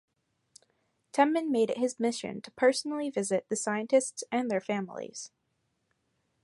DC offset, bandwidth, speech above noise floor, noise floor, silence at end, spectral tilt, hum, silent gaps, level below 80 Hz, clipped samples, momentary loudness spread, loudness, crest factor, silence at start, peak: under 0.1%; 11.5 kHz; 48 dB; -78 dBFS; 1.15 s; -4 dB/octave; none; none; -78 dBFS; under 0.1%; 13 LU; -30 LUFS; 20 dB; 1.15 s; -10 dBFS